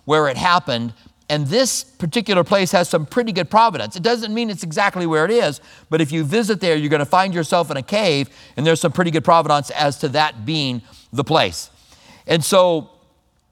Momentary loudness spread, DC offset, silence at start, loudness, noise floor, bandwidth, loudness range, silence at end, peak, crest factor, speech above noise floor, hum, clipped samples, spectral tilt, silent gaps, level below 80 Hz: 9 LU; under 0.1%; 0.05 s; -18 LUFS; -59 dBFS; 17.5 kHz; 2 LU; 0.65 s; 0 dBFS; 18 dB; 41 dB; none; under 0.1%; -4.5 dB/octave; none; -56 dBFS